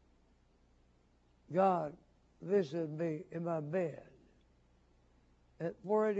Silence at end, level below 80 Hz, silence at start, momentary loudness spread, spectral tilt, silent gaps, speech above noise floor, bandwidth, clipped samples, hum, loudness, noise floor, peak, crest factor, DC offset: 0 s; -72 dBFS; 1.5 s; 12 LU; -7 dB/octave; none; 35 dB; 8 kHz; under 0.1%; none; -37 LUFS; -70 dBFS; -18 dBFS; 20 dB; under 0.1%